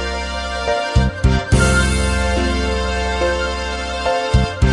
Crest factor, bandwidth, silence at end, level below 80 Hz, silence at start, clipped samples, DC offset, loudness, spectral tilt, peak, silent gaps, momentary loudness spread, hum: 16 dB; 11.5 kHz; 0 s; -22 dBFS; 0 s; under 0.1%; under 0.1%; -18 LUFS; -5 dB/octave; -2 dBFS; none; 7 LU; none